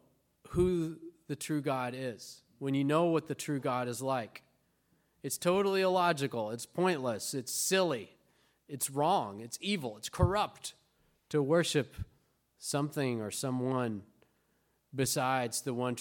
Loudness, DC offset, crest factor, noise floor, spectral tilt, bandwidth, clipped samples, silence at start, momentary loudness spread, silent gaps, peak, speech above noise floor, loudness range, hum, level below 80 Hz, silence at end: -33 LUFS; under 0.1%; 22 dB; -75 dBFS; -4.5 dB/octave; 17.5 kHz; under 0.1%; 0.45 s; 15 LU; none; -12 dBFS; 42 dB; 3 LU; none; -56 dBFS; 0 s